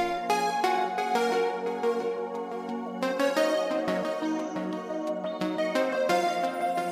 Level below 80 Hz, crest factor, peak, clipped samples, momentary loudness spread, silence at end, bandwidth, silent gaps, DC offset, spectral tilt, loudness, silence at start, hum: -68 dBFS; 18 dB; -10 dBFS; under 0.1%; 7 LU; 0 s; 16 kHz; none; under 0.1%; -4.5 dB/octave; -28 LUFS; 0 s; none